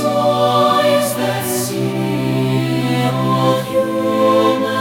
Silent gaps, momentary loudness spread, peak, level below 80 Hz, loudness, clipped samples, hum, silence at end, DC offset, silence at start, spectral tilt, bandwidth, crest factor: none; 6 LU; -2 dBFS; -54 dBFS; -16 LUFS; under 0.1%; none; 0 s; under 0.1%; 0 s; -5.5 dB/octave; 18 kHz; 14 dB